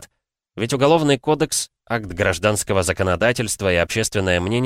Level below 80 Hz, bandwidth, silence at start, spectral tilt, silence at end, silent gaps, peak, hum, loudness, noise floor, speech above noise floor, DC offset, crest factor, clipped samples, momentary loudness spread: -44 dBFS; 16 kHz; 0 s; -4 dB/octave; 0 s; none; -4 dBFS; none; -19 LUFS; -71 dBFS; 52 dB; under 0.1%; 16 dB; under 0.1%; 8 LU